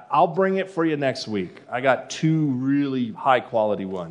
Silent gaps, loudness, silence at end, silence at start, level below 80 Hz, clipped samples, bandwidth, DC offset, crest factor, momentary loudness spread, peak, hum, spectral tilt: none; -23 LUFS; 0 s; 0 s; -74 dBFS; under 0.1%; 10.5 kHz; under 0.1%; 20 dB; 7 LU; -4 dBFS; none; -6.5 dB/octave